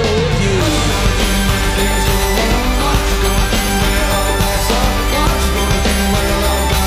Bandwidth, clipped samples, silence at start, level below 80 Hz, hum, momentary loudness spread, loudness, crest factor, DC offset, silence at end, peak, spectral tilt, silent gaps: 16 kHz; under 0.1%; 0 s; -18 dBFS; none; 1 LU; -15 LUFS; 14 dB; under 0.1%; 0 s; 0 dBFS; -4 dB/octave; none